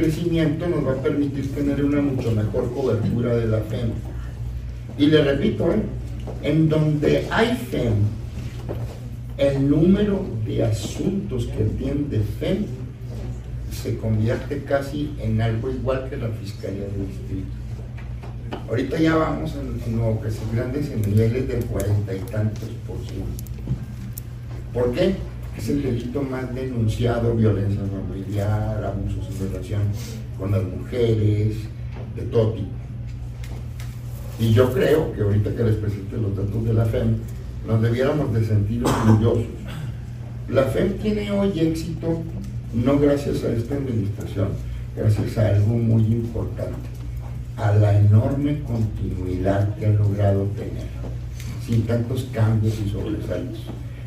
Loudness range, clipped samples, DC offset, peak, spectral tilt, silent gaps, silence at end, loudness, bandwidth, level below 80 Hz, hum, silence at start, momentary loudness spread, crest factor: 5 LU; under 0.1%; under 0.1%; -2 dBFS; -8 dB/octave; none; 0 s; -23 LUFS; 15 kHz; -34 dBFS; none; 0 s; 13 LU; 20 dB